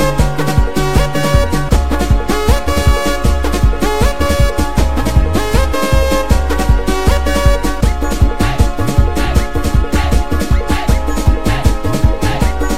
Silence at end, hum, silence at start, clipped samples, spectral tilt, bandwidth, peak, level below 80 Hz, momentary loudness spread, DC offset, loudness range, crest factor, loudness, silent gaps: 0 s; none; 0 s; under 0.1%; -5.5 dB/octave; 16 kHz; 0 dBFS; -14 dBFS; 2 LU; 10%; 1 LU; 14 dB; -14 LUFS; none